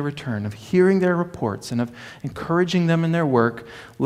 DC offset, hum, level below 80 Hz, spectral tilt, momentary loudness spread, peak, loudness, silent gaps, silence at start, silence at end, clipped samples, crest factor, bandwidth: under 0.1%; none; -56 dBFS; -7 dB/octave; 15 LU; -2 dBFS; -21 LUFS; none; 0 s; 0 s; under 0.1%; 18 dB; 13 kHz